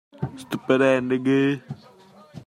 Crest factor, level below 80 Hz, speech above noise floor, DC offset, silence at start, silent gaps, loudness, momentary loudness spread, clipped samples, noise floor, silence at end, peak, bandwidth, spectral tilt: 20 dB; -62 dBFS; 29 dB; under 0.1%; 0.2 s; none; -22 LUFS; 17 LU; under 0.1%; -50 dBFS; 0.05 s; -4 dBFS; 12.5 kHz; -7 dB/octave